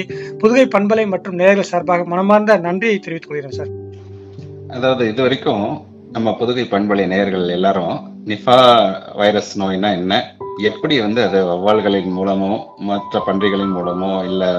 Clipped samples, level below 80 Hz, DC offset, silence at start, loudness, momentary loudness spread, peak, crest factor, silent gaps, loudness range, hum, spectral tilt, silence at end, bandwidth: under 0.1%; -56 dBFS; under 0.1%; 0 s; -16 LUFS; 14 LU; 0 dBFS; 16 dB; none; 5 LU; none; -6 dB/octave; 0 s; 9 kHz